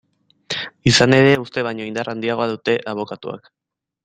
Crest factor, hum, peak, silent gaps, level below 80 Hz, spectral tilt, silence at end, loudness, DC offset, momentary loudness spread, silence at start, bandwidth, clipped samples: 20 dB; none; 0 dBFS; none; -52 dBFS; -4.5 dB/octave; 0.65 s; -18 LUFS; under 0.1%; 16 LU; 0.5 s; 10 kHz; under 0.1%